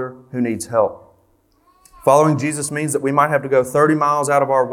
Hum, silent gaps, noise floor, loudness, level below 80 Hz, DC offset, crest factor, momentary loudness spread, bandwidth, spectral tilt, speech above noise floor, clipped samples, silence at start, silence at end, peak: none; none; -58 dBFS; -17 LUFS; -60 dBFS; under 0.1%; 18 dB; 8 LU; 17 kHz; -5.5 dB/octave; 42 dB; under 0.1%; 0 s; 0 s; 0 dBFS